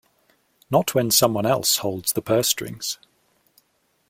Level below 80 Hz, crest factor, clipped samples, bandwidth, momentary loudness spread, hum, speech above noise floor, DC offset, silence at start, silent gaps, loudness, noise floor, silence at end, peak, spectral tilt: -60 dBFS; 22 dB; under 0.1%; 16.5 kHz; 11 LU; none; 46 dB; under 0.1%; 0.7 s; none; -21 LUFS; -67 dBFS; 1.15 s; -2 dBFS; -3 dB/octave